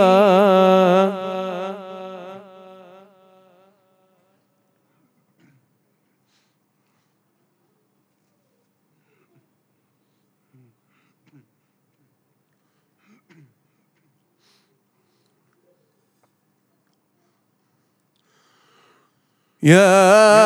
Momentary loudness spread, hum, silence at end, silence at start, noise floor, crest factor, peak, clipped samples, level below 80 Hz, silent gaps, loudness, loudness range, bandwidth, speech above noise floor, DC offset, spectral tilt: 24 LU; none; 0 s; 0 s; -67 dBFS; 22 dB; 0 dBFS; under 0.1%; -80 dBFS; none; -14 LUFS; 26 LU; 15 kHz; 56 dB; under 0.1%; -5.5 dB/octave